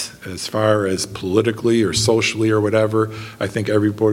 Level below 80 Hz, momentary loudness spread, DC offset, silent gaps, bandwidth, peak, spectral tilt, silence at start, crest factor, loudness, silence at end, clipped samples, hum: -50 dBFS; 8 LU; under 0.1%; none; 16.5 kHz; -2 dBFS; -5 dB/octave; 0 s; 18 dB; -18 LUFS; 0 s; under 0.1%; none